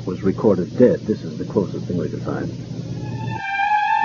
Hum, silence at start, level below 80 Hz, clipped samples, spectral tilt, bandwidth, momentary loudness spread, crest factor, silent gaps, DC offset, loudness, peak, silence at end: none; 0 s; -50 dBFS; under 0.1%; -7.5 dB/octave; 7.2 kHz; 12 LU; 20 dB; none; under 0.1%; -21 LUFS; 0 dBFS; 0 s